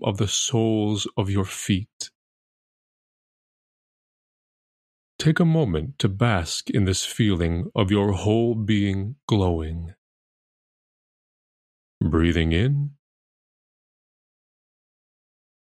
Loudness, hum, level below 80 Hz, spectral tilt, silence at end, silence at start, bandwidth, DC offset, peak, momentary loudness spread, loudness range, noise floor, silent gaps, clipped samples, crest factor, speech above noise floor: -23 LUFS; none; -42 dBFS; -5.5 dB/octave; 2.8 s; 0 s; 14.5 kHz; under 0.1%; -4 dBFS; 8 LU; 8 LU; under -90 dBFS; 1.93-2.00 s, 2.15-5.19 s, 9.23-9.28 s, 9.98-12.01 s; under 0.1%; 20 dB; over 68 dB